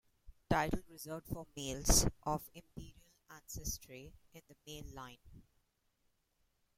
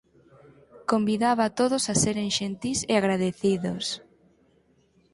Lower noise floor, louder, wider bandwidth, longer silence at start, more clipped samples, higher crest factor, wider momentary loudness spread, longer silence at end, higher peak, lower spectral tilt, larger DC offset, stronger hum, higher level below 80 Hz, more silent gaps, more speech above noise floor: first, -79 dBFS vs -64 dBFS; second, -37 LUFS vs -25 LUFS; first, 16.5 kHz vs 11.5 kHz; second, 0.25 s vs 0.75 s; neither; first, 28 dB vs 18 dB; first, 25 LU vs 7 LU; first, 1.35 s vs 1.15 s; second, -14 dBFS vs -8 dBFS; about the same, -3 dB/octave vs -4 dB/octave; neither; neither; first, -48 dBFS vs -58 dBFS; neither; about the same, 41 dB vs 39 dB